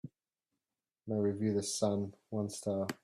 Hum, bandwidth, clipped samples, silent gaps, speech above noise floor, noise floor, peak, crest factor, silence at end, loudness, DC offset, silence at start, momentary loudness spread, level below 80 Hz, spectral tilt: none; 14 kHz; under 0.1%; none; over 55 dB; under -90 dBFS; -20 dBFS; 18 dB; 0.1 s; -36 LUFS; under 0.1%; 0.05 s; 7 LU; -74 dBFS; -5.5 dB/octave